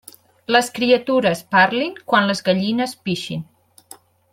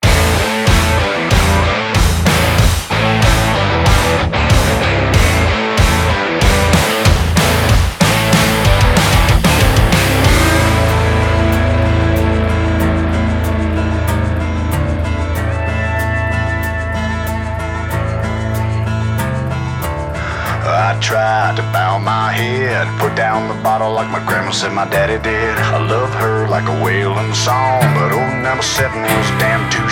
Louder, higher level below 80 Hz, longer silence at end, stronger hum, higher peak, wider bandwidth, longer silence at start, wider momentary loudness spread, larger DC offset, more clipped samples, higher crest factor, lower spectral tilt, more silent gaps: second, -18 LUFS vs -14 LUFS; second, -62 dBFS vs -20 dBFS; first, 0.9 s vs 0 s; neither; about the same, -2 dBFS vs 0 dBFS; about the same, 16.5 kHz vs 18 kHz; first, 0.5 s vs 0 s; first, 10 LU vs 7 LU; neither; neither; about the same, 18 dB vs 14 dB; about the same, -4.5 dB/octave vs -5 dB/octave; neither